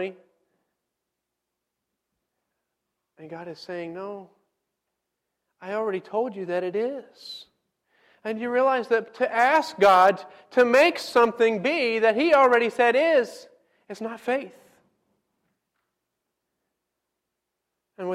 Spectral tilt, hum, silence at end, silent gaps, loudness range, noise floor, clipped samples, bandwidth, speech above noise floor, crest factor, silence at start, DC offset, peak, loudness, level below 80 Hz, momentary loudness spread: -4.5 dB/octave; none; 0 s; none; 20 LU; -83 dBFS; under 0.1%; 15 kHz; 61 dB; 18 dB; 0 s; under 0.1%; -8 dBFS; -22 LUFS; -72 dBFS; 21 LU